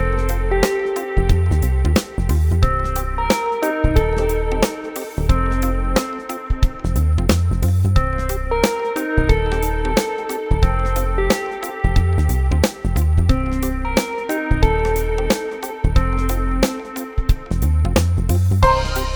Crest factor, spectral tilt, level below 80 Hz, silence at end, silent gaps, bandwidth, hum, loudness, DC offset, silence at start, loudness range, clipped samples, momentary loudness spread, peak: 16 dB; -6 dB/octave; -20 dBFS; 0 s; none; over 20 kHz; none; -19 LUFS; under 0.1%; 0 s; 2 LU; under 0.1%; 5 LU; 0 dBFS